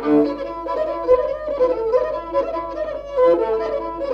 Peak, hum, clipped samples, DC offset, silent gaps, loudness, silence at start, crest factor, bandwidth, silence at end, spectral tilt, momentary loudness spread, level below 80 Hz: -4 dBFS; none; under 0.1%; under 0.1%; none; -20 LUFS; 0 s; 16 dB; 6.4 kHz; 0 s; -7.5 dB/octave; 9 LU; -44 dBFS